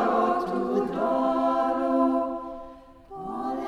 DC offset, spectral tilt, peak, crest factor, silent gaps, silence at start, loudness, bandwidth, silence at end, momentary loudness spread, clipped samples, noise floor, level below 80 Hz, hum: under 0.1%; -7 dB/octave; -12 dBFS; 14 dB; none; 0 s; -26 LUFS; 11.5 kHz; 0 s; 16 LU; under 0.1%; -46 dBFS; -56 dBFS; none